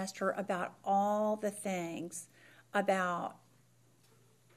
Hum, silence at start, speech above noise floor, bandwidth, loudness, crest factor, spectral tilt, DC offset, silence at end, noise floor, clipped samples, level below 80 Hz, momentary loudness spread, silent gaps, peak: none; 0 s; 33 dB; 15.5 kHz; -35 LUFS; 18 dB; -5 dB/octave; under 0.1%; 1.2 s; -67 dBFS; under 0.1%; -86 dBFS; 13 LU; none; -18 dBFS